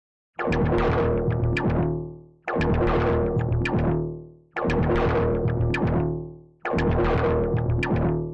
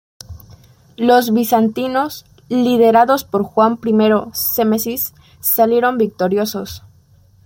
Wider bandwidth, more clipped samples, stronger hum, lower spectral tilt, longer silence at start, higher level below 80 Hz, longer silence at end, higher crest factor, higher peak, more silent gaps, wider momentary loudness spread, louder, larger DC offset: second, 8.2 kHz vs 17 kHz; neither; neither; first, -9 dB/octave vs -5 dB/octave; about the same, 0.4 s vs 0.3 s; first, -34 dBFS vs -52 dBFS; second, 0 s vs 0.65 s; second, 8 dB vs 14 dB; second, -14 dBFS vs -2 dBFS; neither; about the same, 11 LU vs 11 LU; second, -24 LUFS vs -15 LUFS; neither